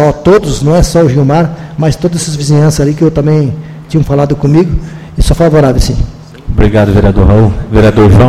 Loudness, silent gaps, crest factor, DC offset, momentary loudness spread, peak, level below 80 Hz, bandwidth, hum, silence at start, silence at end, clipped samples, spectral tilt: -9 LUFS; none; 8 dB; under 0.1%; 9 LU; 0 dBFS; -16 dBFS; 14 kHz; none; 0 s; 0 s; 2%; -7 dB/octave